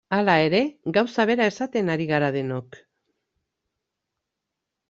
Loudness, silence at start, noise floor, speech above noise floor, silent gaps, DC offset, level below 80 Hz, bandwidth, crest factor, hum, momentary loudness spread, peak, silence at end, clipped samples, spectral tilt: -22 LUFS; 0.1 s; -83 dBFS; 61 dB; none; under 0.1%; -66 dBFS; 7.8 kHz; 20 dB; none; 8 LU; -4 dBFS; 2.25 s; under 0.1%; -6.5 dB/octave